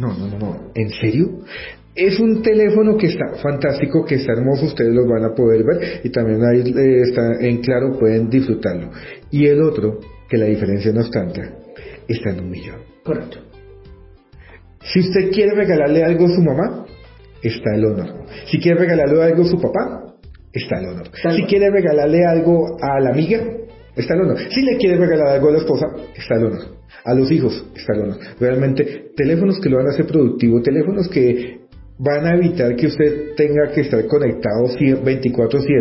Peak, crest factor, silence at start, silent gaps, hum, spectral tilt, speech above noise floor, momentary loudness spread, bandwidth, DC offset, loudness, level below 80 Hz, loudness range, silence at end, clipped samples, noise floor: -2 dBFS; 14 dB; 0 s; none; none; -11.5 dB/octave; 27 dB; 13 LU; 5.8 kHz; under 0.1%; -16 LUFS; -44 dBFS; 4 LU; 0 s; under 0.1%; -43 dBFS